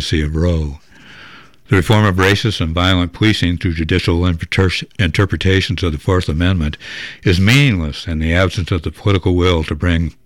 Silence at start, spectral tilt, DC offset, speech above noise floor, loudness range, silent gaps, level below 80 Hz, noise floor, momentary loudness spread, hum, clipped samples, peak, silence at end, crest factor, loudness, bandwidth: 0 s; -6 dB/octave; 0.7%; 26 dB; 1 LU; none; -28 dBFS; -41 dBFS; 8 LU; none; under 0.1%; -2 dBFS; 0.15 s; 14 dB; -15 LUFS; 15.5 kHz